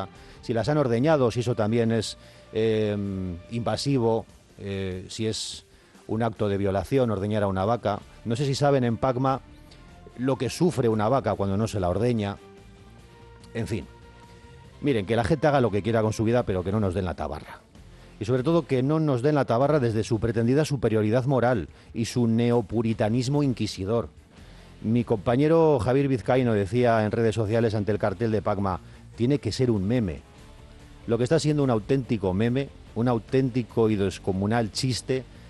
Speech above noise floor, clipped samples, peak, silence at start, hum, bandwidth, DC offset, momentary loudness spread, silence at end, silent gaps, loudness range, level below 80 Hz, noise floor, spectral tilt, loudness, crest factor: 25 dB; under 0.1%; -10 dBFS; 0 s; none; 12.5 kHz; under 0.1%; 10 LU; 0 s; none; 5 LU; -50 dBFS; -49 dBFS; -7 dB/octave; -25 LUFS; 14 dB